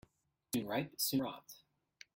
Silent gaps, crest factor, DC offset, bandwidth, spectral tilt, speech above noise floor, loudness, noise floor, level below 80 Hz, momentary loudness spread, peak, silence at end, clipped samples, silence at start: none; 18 dB; under 0.1%; 17 kHz; -4 dB/octave; 30 dB; -38 LUFS; -68 dBFS; -74 dBFS; 21 LU; -22 dBFS; 0.6 s; under 0.1%; 0.55 s